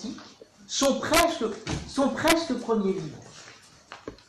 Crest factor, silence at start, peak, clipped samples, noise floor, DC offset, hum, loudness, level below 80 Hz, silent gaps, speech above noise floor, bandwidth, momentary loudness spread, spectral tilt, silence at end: 20 dB; 0 s; -8 dBFS; under 0.1%; -51 dBFS; under 0.1%; none; -25 LUFS; -50 dBFS; none; 25 dB; 13 kHz; 22 LU; -3.5 dB/octave; 0.15 s